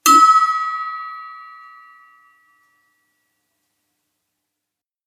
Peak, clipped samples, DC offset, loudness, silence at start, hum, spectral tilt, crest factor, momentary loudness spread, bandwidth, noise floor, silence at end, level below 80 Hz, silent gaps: 0 dBFS; under 0.1%; under 0.1%; -14 LUFS; 0.05 s; none; 1 dB/octave; 20 dB; 27 LU; 16 kHz; -84 dBFS; 3.6 s; -68 dBFS; none